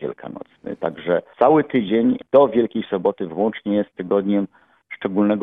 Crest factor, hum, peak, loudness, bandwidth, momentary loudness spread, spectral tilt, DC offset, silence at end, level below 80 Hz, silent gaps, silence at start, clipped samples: 18 dB; none; -2 dBFS; -20 LUFS; 3.9 kHz; 16 LU; -10 dB/octave; under 0.1%; 0 s; -60 dBFS; none; 0 s; under 0.1%